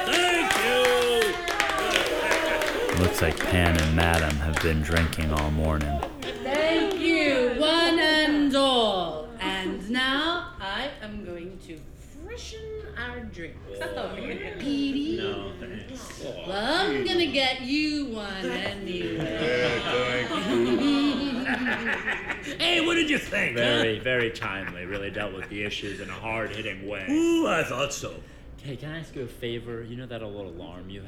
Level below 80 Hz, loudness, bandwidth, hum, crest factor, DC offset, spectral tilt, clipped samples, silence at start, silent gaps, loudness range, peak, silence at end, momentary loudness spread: -40 dBFS; -25 LUFS; 19.5 kHz; none; 22 dB; under 0.1%; -4.5 dB/octave; under 0.1%; 0 s; none; 9 LU; -4 dBFS; 0 s; 16 LU